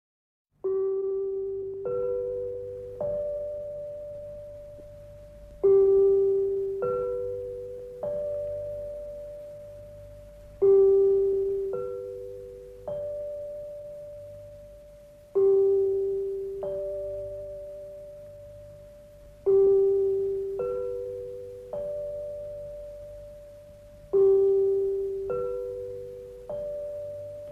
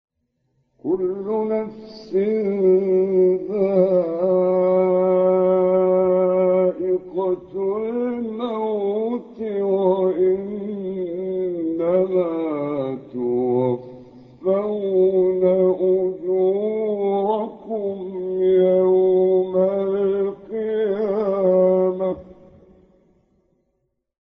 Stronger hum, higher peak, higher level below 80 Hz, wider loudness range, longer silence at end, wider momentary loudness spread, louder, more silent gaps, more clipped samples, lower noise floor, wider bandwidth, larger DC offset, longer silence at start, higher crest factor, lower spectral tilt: neither; second, -14 dBFS vs -6 dBFS; first, -54 dBFS vs -60 dBFS; first, 10 LU vs 5 LU; second, 0 s vs 1.95 s; first, 24 LU vs 10 LU; second, -27 LUFS vs -20 LUFS; neither; neither; second, -50 dBFS vs -72 dBFS; second, 2.8 kHz vs 5 kHz; neither; second, 0.65 s vs 0.85 s; about the same, 16 dB vs 14 dB; about the same, -9 dB/octave vs -8.5 dB/octave